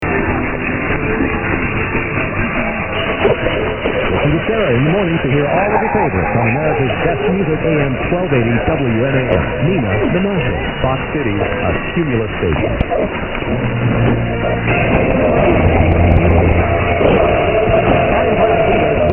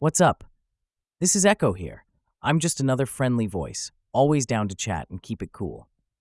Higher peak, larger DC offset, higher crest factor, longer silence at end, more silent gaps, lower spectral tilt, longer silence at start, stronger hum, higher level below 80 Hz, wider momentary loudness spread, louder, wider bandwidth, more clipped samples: first, 0 dBFS vs -6 dBFS; neither; about the same, 14 dB vs 18 dB; second, 0 s vs 0.4 s; neither; first, -10.5 dB/octave vs -4.5 dB/octave; about the same, 0 s vs 0 s; neither; first, -26 dBFS vs -52 dBFS; second, 5 LU vs 15 LU; first, -15 LUFS vs -24 LUFS; second, 3.4 kHz vs 12 kHz; neither